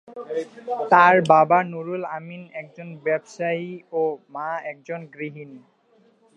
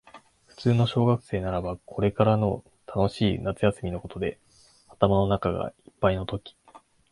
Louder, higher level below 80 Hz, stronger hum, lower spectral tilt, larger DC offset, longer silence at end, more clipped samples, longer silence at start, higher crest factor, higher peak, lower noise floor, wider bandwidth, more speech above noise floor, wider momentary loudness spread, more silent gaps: first, -21 LUFS vs -26 LUFS; second, -78 dBFS vs -46 dBFS; neither; second, -6.5 dB/octave vs -8 dB/octave; neither; first, 0.8 s vs 0.35 s; neither; about the same, 0.1 s vs 0.15 s; about the same, 22 dB vs 24 dB; about the same, -2 dBFS vs -4 dBFS; about the same, -60 dBFS vs -57 dBFS; second, 9.6 kHz vs 11 kHz; first, 37 dB vs 32 dB; first, 21 LU vs 11 LU; neither